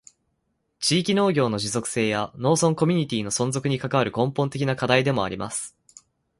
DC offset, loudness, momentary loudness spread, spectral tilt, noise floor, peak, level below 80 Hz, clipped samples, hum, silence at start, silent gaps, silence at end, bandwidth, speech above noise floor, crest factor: under 0.1%; -23 LUFS; 6 LU; -4.5 dB/octave; -74 dBFS; -4 dBFS; -58 dBFS; under 0.1%; none; 0.8 s; none; 0.7 s; 11.5 kHz; 51 dB; 20 dB